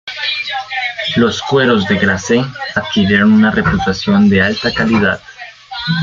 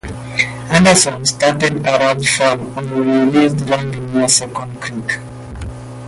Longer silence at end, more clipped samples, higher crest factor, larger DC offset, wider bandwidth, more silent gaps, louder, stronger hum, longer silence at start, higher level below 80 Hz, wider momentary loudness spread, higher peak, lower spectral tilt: about the same, 0 s vs 0 s; neither; about the same, 12 dB vs 16 dB; neither; second, 7.4 kHz vs 12 kHz; neither; about the same, -13 LUFS vs -14 LUFS; neither; about the same, 0.05 s vs 0.05 s; about the same, -40 dBFS vs -40 dBFS; second, 9 LU vs 14 LU; about the same, -2 dBFS vs 0 dBFS; first, -5.5 dB/octave vs -3.5 dB/octave